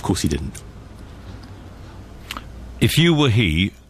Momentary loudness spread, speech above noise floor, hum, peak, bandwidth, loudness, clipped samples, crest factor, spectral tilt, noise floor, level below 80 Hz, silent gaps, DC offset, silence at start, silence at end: 25 LU; 20 dB; none; -4 dBFS; 15.5 kHz; -18 LUFS; under 0.1%; 16 dB; -5 dB/octave; -38 dBFS; -36 dBFS; none; under 0.1%; 0 s; 0.15 s